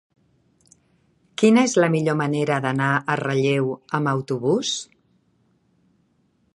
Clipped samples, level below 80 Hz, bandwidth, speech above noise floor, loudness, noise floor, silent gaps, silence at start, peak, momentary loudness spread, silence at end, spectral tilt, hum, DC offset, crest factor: under 0.1%; -68 dBFS; 11.5 kHz; 45 dB; -21 LUFS; -65 dBFS; none; 1.4 s; -4 dBFS; 9 LU; 1.7 s; -5.5 dB/octave; none; under 0.1%; 20 dB